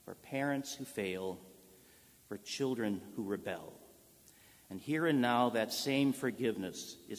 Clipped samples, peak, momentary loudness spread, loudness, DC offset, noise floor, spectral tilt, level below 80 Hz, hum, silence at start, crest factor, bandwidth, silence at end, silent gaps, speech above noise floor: under 0.1%; -16 dBFS; 16 LU; -36 LUFS; under 0.1%; -63 dBFS; -4.5 dB/octave; -72 dBFS; none; 0.05 s; 20 dB; 16 kHz; 0 s; none; 27 dB